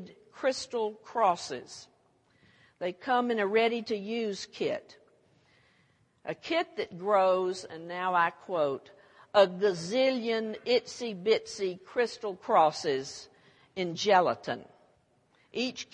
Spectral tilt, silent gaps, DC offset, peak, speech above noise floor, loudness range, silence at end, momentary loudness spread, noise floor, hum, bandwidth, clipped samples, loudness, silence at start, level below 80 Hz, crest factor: -4 dB/octave; none; under 0.1%; -10 dBFS; 38 dB; 4 LU; 0.1 s; 15 LU; -68 dBFS; none; 10.5 kHz; under 0.1%; -30 LUFS; 0 s; -78 dBFS; 22 dB